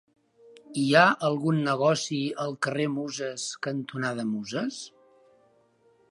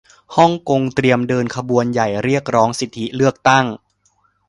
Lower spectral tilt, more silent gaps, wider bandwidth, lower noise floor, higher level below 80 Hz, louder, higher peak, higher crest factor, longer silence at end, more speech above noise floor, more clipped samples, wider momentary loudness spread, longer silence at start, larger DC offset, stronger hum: about the same, -4.5 dB/octave vs -5.5 dB/octave; neither; about the same, 11.5 kHz vs 11.5 kHz; about the same, -63 dBFS vs -61 dBFS; second, -76 dBFS vs -52 dBFS; second, -27 LUFS vs -16 LUFS; second, -4 dBFS vs 0 dBFS; first, 24 dB vs 16 dB; first, 1.25 s vs 0.7 s; second, 37 dB vs 45 dB; neither; first, 13 LU vs 8 LU; first, 0.7 s vs 0.3 s; neither; neither